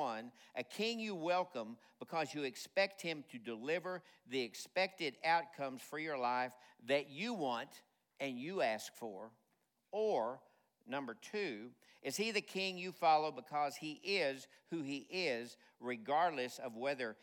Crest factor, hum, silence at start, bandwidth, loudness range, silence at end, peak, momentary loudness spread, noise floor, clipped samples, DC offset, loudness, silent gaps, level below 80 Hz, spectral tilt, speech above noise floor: 20 dB; none; 0 s; 18 kHz; 4 LU; 0.1 s; -20 dBFS; 13 LU; -82 dBFS; under 0.1%; under 0.1%; -40 LUFS; none; under -90 dBFS; -3.5 dB/octave; 41 dB